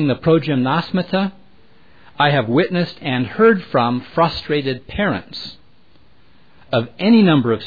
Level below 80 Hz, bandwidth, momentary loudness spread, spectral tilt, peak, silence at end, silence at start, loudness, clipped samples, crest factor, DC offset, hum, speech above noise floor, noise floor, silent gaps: -48 dBFS; 5 kHz; 9 LU; -8.5 dB/octave; -2 dBFS; 0 s; 0 s; -17 LUFS; under 0.1%; 16 dB; 0.6%; none; 37 dB; -54 dBFS; none